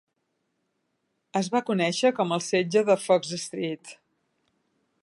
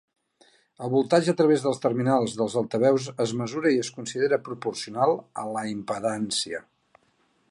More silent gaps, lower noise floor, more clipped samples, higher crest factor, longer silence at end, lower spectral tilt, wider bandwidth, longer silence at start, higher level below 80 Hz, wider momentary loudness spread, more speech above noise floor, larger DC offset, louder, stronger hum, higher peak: neither; first, -77 dBFS vs -67 dBFS; neither; about the same, 20 dB vs 18 dB; first, 1.1 s vs 0.9 s; about the same, -4.5 dB/octave vs -5 dB/octave; about the same, 11.5 kHz vs 11.5 kHz; first, 1.35 s vs 0.8 s; second, -76 dBFS vs -70 dBFS; about the same, 10 LU vs 10 LU; first, 52 dB vs 42 dB; neither; about the same, -25 LUFS vs -25 LUFS; neither; about the same, -8 dBFS vs -6 dBFS